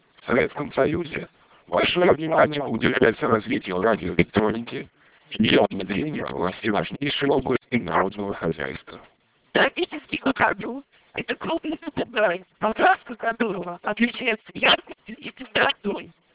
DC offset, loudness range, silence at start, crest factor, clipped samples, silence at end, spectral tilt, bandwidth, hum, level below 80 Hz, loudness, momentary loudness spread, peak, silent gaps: under 0.1%; 4 LU; 0.25 s; 22 dB; under 0.1%; 0.25 s; -9 dB/octave; 4 kHz; none; -52 dBFS; -23 LUFS; 13 LU; -2 dBFS; none